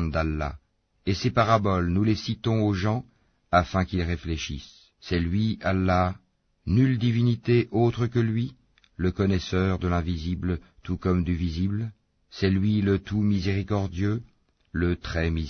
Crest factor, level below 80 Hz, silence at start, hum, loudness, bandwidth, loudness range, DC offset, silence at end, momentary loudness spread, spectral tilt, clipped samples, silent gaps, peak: 18 dB; -42 dBFS; 0 s; none; -26 LUFS; 6.6 kHz; 3 LU; under 0.1%; 0 s; 10 LU; -7.5 dB/octave; under 0.1%; none; -6 dBFS